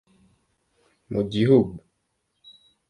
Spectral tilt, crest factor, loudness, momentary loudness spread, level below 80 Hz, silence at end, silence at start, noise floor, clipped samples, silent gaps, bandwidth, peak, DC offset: -8.5 dB/octave; 20 dB; -22 LUFS; 14 LU; -56 dBFS; 1.1 s; 1.1 s; -74 dBFS; under 0.1%; none; 10 kHz; -6 dBFS; under 0.1%